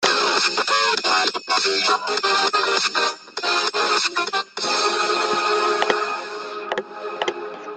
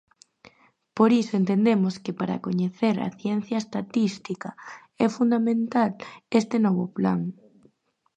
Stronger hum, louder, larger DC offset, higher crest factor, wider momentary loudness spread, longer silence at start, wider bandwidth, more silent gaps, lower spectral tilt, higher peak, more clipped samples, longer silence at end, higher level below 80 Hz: neither; first, -20 LUFS vs -25 LUFS; neither; about the same, 20 dB vs 20 dB; second, 10 LU vs 14 LU; second, 0 s vs 0.95 s; about the same, 9.4 kHz vs 8.8 kHz; neither; second, -0.5 dB/octave vs -7 dB/octave; first, -2 dBFS vs -6 dBFS; neither; second, 0 s vs 0.85 s; about the same, -72 dBFS vs -68 dBFS